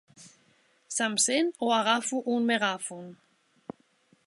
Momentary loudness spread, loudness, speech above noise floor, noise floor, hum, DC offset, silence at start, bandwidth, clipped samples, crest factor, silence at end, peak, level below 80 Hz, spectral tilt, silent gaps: 23 LU; -27 LUFS; 39 dB; -66 dBFS; none; under 0.1%; 0.2 s; 11.5 kHz; under 0.1%; 20 dB; 1.1 s; -10 dBFS; -82 dBFS; -2 dB/octave; none